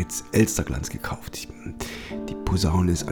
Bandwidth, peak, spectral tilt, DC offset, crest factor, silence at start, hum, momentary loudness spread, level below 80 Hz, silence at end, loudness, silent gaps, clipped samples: 20 kHz; -6 dBFS; -5 dB/octave; under 0.1%; 18 dB; 0 s; none; 13 LU; -36 dBFS; 0 s; -26 LUFS; none; under 0.1%